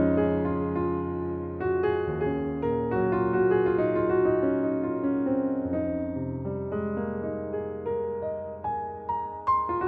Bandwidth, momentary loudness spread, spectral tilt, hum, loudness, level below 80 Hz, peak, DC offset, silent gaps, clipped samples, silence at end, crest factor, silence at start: 4.6 kHz; 9 LU; -11.5 dB/octave; none; -28 LUFS; -50 dBFS; -14 dBFS; under 0.1%; none; under 0.1%; 0 s; 14 dB; 0 s